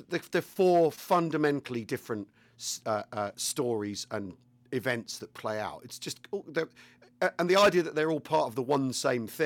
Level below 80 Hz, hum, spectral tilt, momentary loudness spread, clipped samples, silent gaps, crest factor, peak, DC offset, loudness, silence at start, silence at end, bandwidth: -72 dBFS; none; -4.5 dB/octave; 14 LU; under 0.1%; none; 18 dB; -12 dBFS; under 0.1%; -30 LUFS; 0 s; 0 s; 19 kHz